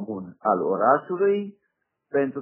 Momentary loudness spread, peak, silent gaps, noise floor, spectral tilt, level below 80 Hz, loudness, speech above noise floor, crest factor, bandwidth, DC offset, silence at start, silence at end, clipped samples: 9 LU; -4 dBFS; none; -76 dBFS; -6 dB/octave; -80 dBFS; -23 LUFS; 54 dB; 20 dB; 3.2 kHz; under 0.1%; 0 s; 0 s; under 0.1%